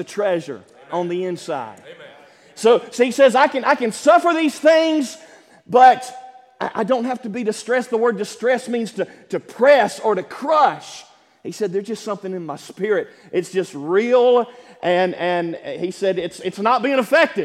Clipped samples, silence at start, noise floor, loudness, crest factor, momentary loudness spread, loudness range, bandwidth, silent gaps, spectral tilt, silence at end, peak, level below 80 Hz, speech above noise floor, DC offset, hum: under 0.1%; 0 s; -46 dBFS; -19 LUFS; 18 dB; 15 LU; 6 LU; 14 kHz; none; -4.5 dB/octave; 0 s; 0 dBFS; -72 dBFS; 28 dB; under 0.1%; none